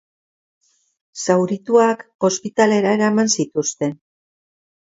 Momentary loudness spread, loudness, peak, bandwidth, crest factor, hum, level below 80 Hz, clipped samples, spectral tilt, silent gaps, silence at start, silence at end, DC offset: 10 LU; -18 LUFS; 0 dBFS; 8 kHz; 20 dB; none; -68 dBFS; under 0.1%; -4.5 dB/octave; 2.15-2.19 s; 1.15 s; 1 s; under 0.1%